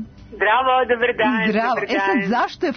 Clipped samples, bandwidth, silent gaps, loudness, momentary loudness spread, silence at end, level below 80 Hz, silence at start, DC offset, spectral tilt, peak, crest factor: under 0.1%; 6.6 kHz; none; -18 LUFS; 4 LU; 0 s; -52 dBFS; 0 s; under 0.1%; -6 dB/octave; -6 dBFS; 12 dB